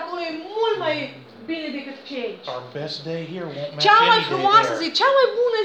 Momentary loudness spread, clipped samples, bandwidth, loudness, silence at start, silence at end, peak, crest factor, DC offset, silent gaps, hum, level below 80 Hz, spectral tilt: 17 LU; under 0.1%; 8.8 kHz; -20 LUFS; 0 s; 0 s; 0 dBFS; 20 dB; under 0.1%; none; none; -76 dBFS; -4 dB/octave